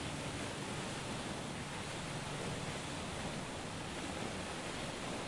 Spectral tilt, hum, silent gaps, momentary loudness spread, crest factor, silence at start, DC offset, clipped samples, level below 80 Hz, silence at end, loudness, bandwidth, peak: -4 dB/octave; none; none; 1 LU; 16 dB; 0 s; under 0.1%; under 0.1%; -58 dBFS; 0 s; -42 LUFS; 11.5 kHz; -26 dBFS